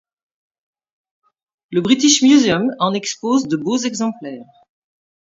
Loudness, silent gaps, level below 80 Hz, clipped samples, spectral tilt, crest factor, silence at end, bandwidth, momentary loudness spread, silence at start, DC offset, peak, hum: -16 LUFS; none; -60 dBFS; under 0.1%; -3.5 dB/octave; 18 dB; 0.8 s; 7.8 kHz; 13 LU; 1.7 s; under 0.1%; 0 dBFS; none